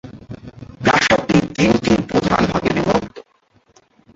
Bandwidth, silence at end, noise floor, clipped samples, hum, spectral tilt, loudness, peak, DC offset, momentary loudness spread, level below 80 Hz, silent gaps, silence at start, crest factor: 8 kHz; 0.95 s; -58 dBFS; under 0.1%; none; -5.5 dB/octave; -16 LUFS; -2 dBFS; under 0.1%; 21 LU; -40 dBFS; none; 0.05 s; 18 dB